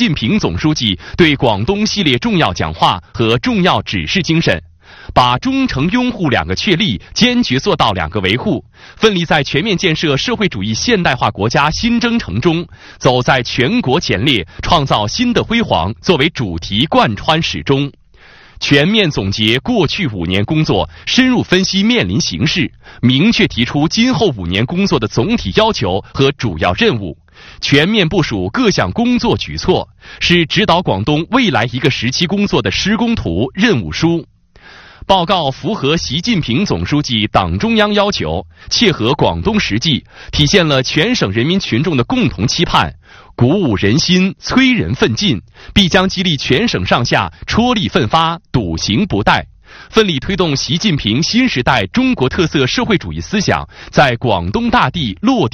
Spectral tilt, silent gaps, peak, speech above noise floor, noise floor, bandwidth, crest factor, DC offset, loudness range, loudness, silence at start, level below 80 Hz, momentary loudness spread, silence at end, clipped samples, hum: -5 dB/octave; none; 0 dBFS; 28 dB; -42 dBFS; 10.5 kHz; 14 dB; under 0.1%; 2 LU; -13 LUFS; 0 s; -34 dBFS; 5 LU; 0.05 s; 0.1%; none